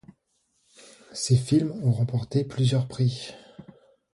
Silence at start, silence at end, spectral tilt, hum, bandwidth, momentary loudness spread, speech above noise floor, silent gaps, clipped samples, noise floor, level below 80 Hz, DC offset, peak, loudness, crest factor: 1.1 s; 0.5 s; -6.5 dB/octave; none; 11.5 kHz; 16 LU; 48 dB; none; under 0.1%; -72 dBFS; -56 dBFS; under 0.1%; -8 dBFS; -25 LUFS; 18 dB